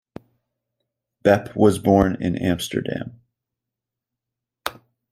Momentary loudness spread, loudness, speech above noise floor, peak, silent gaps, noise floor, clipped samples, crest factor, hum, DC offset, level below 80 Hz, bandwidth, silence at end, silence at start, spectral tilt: 15 LU; -20 LUFS; 66 dB; -2 dBFS; none; -86 dBFS; under 0.1%; 22 dB; none; under 0.1%; -48 dBFS; 16 kHz; 0.4 s; 1.25 s; -6.5 dB/octave